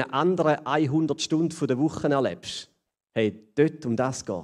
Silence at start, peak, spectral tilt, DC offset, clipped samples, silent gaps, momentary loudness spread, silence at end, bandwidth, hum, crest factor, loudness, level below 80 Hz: 0 s; -8 dBFS; -5.5 dB/octave; under 0.1%; under 0.1%; none; 7 LU; 0 s; 11.5 kHz; none; 18 dB; -26 LUFS; -62 dBFS